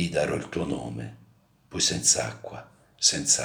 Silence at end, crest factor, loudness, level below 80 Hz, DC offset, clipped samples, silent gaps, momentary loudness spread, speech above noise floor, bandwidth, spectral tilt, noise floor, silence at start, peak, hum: 0 s; 22 dB; -24 LUFS; -56 dBFS; under 0.1%; under 0.1%; none; 21 LU; 32 dB; over 20 kHz; -2 dB/octave; -59 dBFS; 0 s; -6 dBFS; none